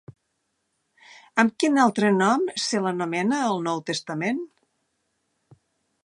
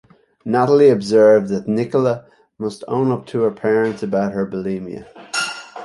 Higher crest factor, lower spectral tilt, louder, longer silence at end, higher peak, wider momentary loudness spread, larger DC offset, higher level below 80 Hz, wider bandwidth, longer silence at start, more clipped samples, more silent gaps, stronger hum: first, 22 dB vs 16 dB; second, -4.5 dB/octave vs -6 dB/octave; second, -23 LUFS vs -18 LUFS; first, 1.6 s vs 0 s; about the same, -2 dBFS vs -2 dBFS; second, 8 LU vs 15 LU; neither; second, -74 dBFS vs -58 dBFS; about the same, 11.5 kHz vs 11.5 kHz; first, 1.35 s vs 0.45 s; neither; neither; neither